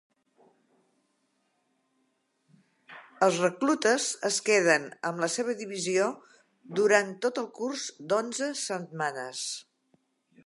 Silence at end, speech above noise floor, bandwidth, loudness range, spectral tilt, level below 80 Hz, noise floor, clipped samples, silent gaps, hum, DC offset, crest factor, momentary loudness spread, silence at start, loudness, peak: 0.85 s; 46 dB; 11.5 kHz; 6 LU; -3 dB/octave; -86 dBFS; -74 dBFS; under 0.1%; none; none; under 0.1%; 22 dB; 11 LU; 2.9 s; -28 LUFS; -8 dBFS